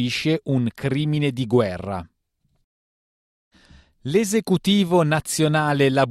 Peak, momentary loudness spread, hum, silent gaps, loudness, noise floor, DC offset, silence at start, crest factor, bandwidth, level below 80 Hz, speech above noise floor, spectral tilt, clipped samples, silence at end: -6 dBFS; 7 LU; none; 2.64-3.51 s; -21 LUFS; -69 dBFS; under 0.1%; 0 s; 16 dB; 15.5 kHz; -54 dBFS; 49 dB; -5.5 dB/octave; under 0.1%; 0 s